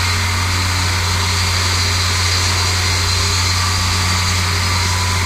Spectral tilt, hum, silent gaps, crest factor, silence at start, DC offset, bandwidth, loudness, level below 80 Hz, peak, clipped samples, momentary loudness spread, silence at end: -2.5 dB/octave; none; none; 14 dB; 0 s; under 0.1%; 16 kHz; -15 LUFS; -30 dBFS; -2 dBFS; under 0.1%; 2 LU; 0 s